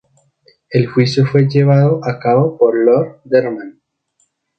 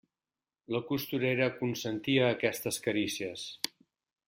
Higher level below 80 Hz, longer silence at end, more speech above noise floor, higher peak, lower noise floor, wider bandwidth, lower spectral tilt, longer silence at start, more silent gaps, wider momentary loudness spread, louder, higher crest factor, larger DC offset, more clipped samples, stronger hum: first, -56 dBFS vs -70 dBFS; first, 0.9 s vs 0.6 s; second, 51 dB vs over 58 dB; first, 0 dBFS vs -12 dBFS; second, -63 dBFS vs under -90 dBFS; second, 7.8 kHz vs 16.5 kHz; first, -8 dB/octave vs -4.5 dB/octave; about the same, 0.7 s vs 0.7 s; neither; about the same, 8 LU vs 9 LU; first, -14 LUFS vs -32 LUFS; second, 14 dB vs 22 dB; neither; neither; neither